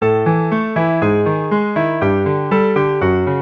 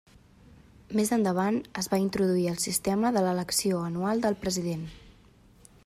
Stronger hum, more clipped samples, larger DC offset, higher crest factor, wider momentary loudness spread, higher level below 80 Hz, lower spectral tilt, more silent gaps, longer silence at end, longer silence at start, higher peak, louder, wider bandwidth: neither; neither; neither; second, 12 dB vs 18 dB; second, 2 LU vs 5 LU; first, -46 dBFS vs -58 dBFS; first, -9.5 dB/octave vs -5 dB/octave; neither; second, 0 s vs 0.75 s; second, 0 s vs 0.9 s; first, -4 dBFS vs -10 dBFS; first, -16 LUFS vs -28 LUFS; second, 6 kHz vs 15.5 kHz